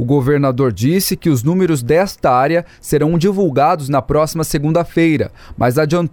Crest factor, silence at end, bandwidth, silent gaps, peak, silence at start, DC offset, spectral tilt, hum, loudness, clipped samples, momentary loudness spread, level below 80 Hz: 12 dB; 0.05 s; over 20 kHz; none; -2 dBFS; 0 s; under 0.1%; -6.5 dB/octave; none; -15 LUFS; under 0.1%; 4 LU; -38 dBFS